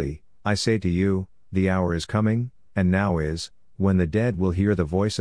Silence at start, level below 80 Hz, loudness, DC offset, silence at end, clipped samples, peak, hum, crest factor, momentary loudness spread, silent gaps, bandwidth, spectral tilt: 0 s; -42 dBFS; -24 LUFS; 0.3%; 0 s; under 0.1%; -6 dBFS; none; 16 dB; 8 LU; none; 10.5 kHz; -6.5 dB/octave